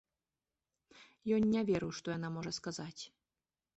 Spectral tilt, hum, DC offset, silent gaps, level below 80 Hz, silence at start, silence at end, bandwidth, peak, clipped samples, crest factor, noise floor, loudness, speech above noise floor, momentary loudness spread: -5.5 dB/octave; none; under 0.1%; none; -68 dBFS; 0.95 s; 0.7 s; 8.2 kHz; -22 dBFS; under 0.1%; 16 dB; under -90 dBFS; -37 LUFS; over 54 dB; 15 LU